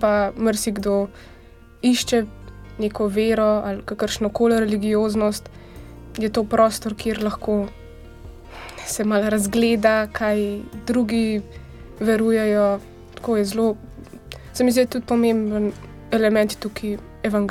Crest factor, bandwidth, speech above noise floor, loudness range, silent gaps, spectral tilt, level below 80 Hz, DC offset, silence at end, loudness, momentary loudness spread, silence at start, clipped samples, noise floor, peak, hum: 18 dB; 16 kHz; 19 dB; 2 LU; none; -5 dB/octave; -44 dBFS; under 0.1%; 0 s; -21 LUFS; 20 LU; 0 s; under 0.1%; -40 dBFS; -4 dBFS; none